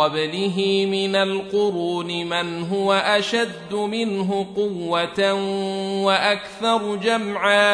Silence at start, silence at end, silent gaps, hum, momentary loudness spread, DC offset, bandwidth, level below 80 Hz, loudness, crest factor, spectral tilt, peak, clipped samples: 0 s; 0 s; none; none; 6 LU; under 0.1%; 11 kHz; -62 dBFS; -21 LUFS; 18 dB; -4.5 dB/octave; -4 dBFS; under 0.1%